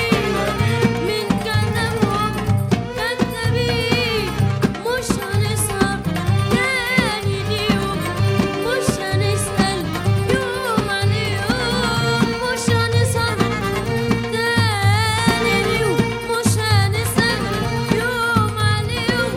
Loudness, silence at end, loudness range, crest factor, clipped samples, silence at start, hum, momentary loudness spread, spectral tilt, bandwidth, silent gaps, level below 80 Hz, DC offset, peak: -19 LUFS; 0 s; 2 LU; 18 dB; under 0.1%; 0 s; none; 4 LU; -5 dB/octave; 16 kHz; none; -36 dBFS; under 0.1%; -2 dBFS